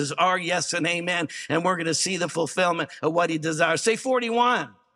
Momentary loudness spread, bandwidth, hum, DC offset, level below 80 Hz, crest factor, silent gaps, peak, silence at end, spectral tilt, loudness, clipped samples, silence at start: 5 LU; 14 kHz; none; under 0.1%; -76 dBFS; 18 dB; none; -6 dBFS; 0.25 s; -3 dB/octave; -24 LUFS; under 0.1%; 0 s